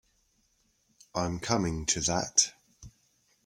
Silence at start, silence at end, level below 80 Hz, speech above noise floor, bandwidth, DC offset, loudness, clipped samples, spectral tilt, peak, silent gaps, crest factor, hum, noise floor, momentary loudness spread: 1.15 s; 0.55 s; -54 dBFS; 42 dB; 16.5 kHz; under 0.1%; -28 LUFS; under 0.1%; -2.5 dB/octave; -6 dBFS; none; 26 dB; none; -71 dBFS; 9 LU